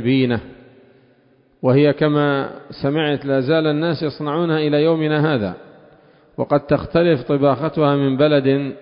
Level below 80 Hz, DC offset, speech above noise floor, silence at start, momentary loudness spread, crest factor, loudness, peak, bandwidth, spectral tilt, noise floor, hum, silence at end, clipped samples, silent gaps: -50 dBFS; under 0.1%; 38 dB; 0 s; 8 LU; 14 dB; -18 LUFS; -4 dBFS; 5.4 kHz; -12 dB/octave; -56 dBFS; none; 0 s; under 0.1%; none